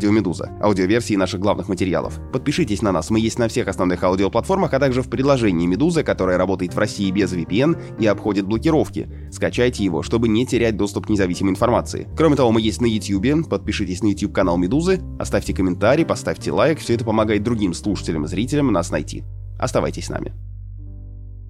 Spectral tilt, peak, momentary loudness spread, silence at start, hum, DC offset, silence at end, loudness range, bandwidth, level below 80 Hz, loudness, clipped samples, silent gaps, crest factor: -6 dB/octave; -4 dBFS; 8 LU; 0 s; none; under 0.1%; 0 s; 2 LU; 13 kHz; -36 dBFS; -20 LUFS; under 0.1%; none; 16 dB